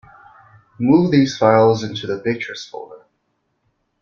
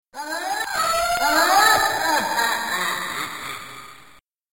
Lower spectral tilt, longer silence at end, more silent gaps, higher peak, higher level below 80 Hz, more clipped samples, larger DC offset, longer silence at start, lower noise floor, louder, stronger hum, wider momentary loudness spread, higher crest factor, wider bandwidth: first, -6.5 dB/octave vs -0.5 dB/octave; first, 1.05 s vs 0.6 s; neither; first, -2 dBFS vs -6 dBFS; second, -58 dBFS vs -52 dBFS; neither; second, under 0.1% vs 0.3%; first, 0.8 s vs 0.15 s; first, -69 dBFS vs -52 dBFS; first, -17 LUFS vs -20 LUFS; neither; first, 19 LU vs 16 LU; about the same, 18 dB vs 16 dB; second, 7.2 kHz vs 17 kHz